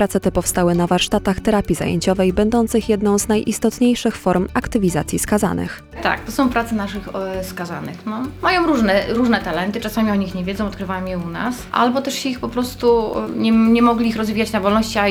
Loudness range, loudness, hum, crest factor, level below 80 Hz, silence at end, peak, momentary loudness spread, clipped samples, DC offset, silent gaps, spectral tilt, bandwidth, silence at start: 4 LU; -18 LUFS; none; 16 dB; -38 dBFS; 0 s; -2 dBFS; 9 LU; under 0.1%; under 0.1%; none; -5 dB/octave; 17 kHz; 0 s